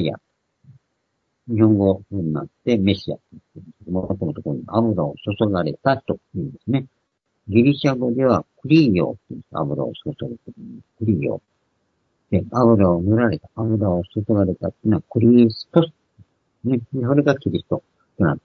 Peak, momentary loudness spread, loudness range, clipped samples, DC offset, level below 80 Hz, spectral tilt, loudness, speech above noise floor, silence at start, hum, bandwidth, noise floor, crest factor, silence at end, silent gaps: 0 dBFS; 14 LU; 4 LU; under 0.1%; under 0.1%; -52 dBFS; -9 dB/octave; -20 LUFS; 53 dB; 0 s; none; 6.4 kHz; -73 dBFS; 20 dB; 0.05 s; none